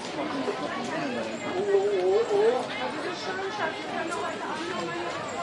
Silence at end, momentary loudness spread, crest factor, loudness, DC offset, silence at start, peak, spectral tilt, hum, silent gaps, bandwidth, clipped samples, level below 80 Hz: 0 s; 8 LU; 16 dB; -28 LUFS; under 0.1%; 0 s; -12 dBFS; -4 dB/octave; none; none; 11.5 kHz; under 0.1%; -70 dBFS